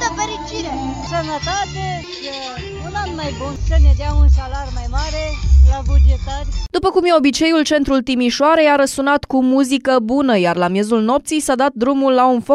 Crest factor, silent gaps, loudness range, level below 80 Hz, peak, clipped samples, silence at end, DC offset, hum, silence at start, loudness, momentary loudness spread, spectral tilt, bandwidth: 12 dB; none; 6 LU; -20 dBFS; -2 dBFS; under 0.1%; 0 s; under 0.1%; none; 0 s; -16 LUFS; 11 LU; -5.5 dB/octave; 12 kHz